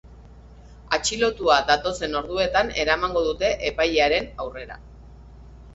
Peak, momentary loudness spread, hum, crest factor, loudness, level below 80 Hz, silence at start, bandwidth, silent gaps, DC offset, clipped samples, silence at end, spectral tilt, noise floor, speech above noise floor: -2 dBFS; 14 LU; none; 22 dB; -22 LUFS; -42 dBFS; 0.05 s; 8.2 kHz; none; under 0.1%; under 0.1%; 0 s; -3 dB/octave; -45 dBFS; 23 dB